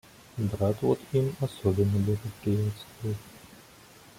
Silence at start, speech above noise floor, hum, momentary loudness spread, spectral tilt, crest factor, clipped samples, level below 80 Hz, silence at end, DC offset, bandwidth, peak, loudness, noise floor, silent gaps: 0.35 s; 25 dB; none; 12 LU; -8 dB/octave; 18 dB; under 0.1%; -56 dBFS; 0.65 s; under 0.1%; 16 kHz; -12 dBFS; -29 LUFS; -53 dBFS; none